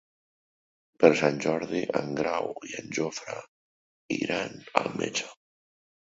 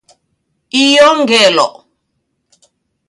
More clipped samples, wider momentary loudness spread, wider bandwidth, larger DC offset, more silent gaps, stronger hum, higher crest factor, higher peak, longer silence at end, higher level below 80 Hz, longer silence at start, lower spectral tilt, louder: neither; first, 15 LU vs 10 LU; second, 8 kHz vs 11.5 kHz; neither; first, 3.48-4.09 s vs none; neither; first, 28 dB vs 14 dB; about the same, -2 dBFS vs 0 dBFS; second, 0.8 s vs 1.4 s; second, -68 dBFS vs -60 dBFS; first, 1 s vs 0.75 s; first, -4.5 dB/octave vs -2 dB/octave; second, -28 LUFS vs -9 LUFS